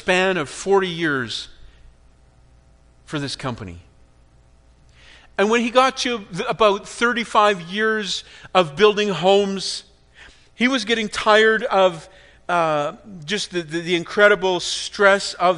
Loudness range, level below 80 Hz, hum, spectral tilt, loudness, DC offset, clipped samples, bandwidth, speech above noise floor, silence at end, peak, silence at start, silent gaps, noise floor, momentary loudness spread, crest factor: 12 LU; -52 dBFS; none; -3.5 dB/octave; -19 LUFS; under 0.1%; under 0.1%; 10.5 kHz; 33 dB; 0 s; 0 dBFS; 0.05 s; none; -52 dBFS; 13 LU; 20 dB